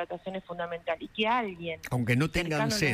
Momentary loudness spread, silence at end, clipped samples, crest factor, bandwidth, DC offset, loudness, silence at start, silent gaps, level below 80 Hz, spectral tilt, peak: 10 LU; 0 s; under 0.1%; 16 dB; 16 kHz; under 0.1%; -30 LUFS; 0 s; none; -50 dBFS; -5 dB/octave; -14 dBFS